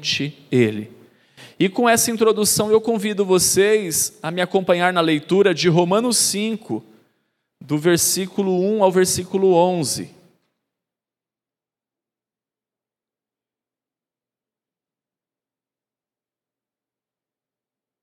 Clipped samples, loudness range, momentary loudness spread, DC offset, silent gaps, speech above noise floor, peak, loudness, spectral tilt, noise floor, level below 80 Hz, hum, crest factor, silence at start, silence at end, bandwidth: under 0.1%; 5 LU; 8 LU; under 0.1%; none; over 72 dB; -2 dBFS; -18 LUFS; -3.5 dB/octave; under -90 dBFS; -62 dBFS; none; 20 dB; 0 s; 7.95 s; 16 kHz